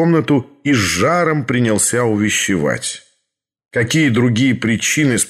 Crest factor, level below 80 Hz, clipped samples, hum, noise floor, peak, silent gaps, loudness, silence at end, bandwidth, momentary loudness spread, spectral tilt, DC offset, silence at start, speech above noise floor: 12 dB; -50 dBFS; under 0.1%; none; -73 dBFS; -4 dBFS; none; -15 LUFS; 0 s; 15 kHz; 6 LU; -4.5 dB/octave; under 0.1%; 0 s; 58 dB